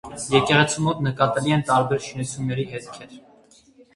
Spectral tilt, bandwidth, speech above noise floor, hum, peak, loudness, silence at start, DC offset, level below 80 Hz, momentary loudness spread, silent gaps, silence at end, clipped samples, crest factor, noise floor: -5 dB/octave; 11.5 kHz; 32 dB; none; -2 dBFS; -21 LUFS; 0.05 s; under 0.1%; -54 dBFS; 14 LU; none; 0.75 s; under 0.1%; 22 dB; -54 dBFS